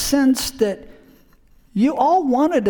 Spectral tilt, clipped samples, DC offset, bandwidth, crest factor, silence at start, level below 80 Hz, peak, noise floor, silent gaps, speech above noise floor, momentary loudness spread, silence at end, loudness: -4.5 dB/octave; under 0.1%; under 0.1%; 19.5 kHz; 14 dB; 0 s; -46 dBFS; -4 dBFS; -52 dBFS; none; 34 dB; 9 LU; 0 s; -18 LUFS